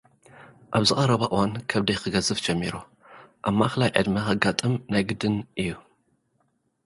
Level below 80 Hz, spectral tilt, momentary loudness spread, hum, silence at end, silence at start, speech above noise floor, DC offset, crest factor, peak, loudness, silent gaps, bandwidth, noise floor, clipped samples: -52 dBFS; -5 dB/octave; 9 LU; none; 1.05 s; 0.35 s; 46 dB; under 0.1%; 26 dB; 0 dBFS; -24 LUFS; none; 11.5 kHz; -70 dBFS; under 0.1%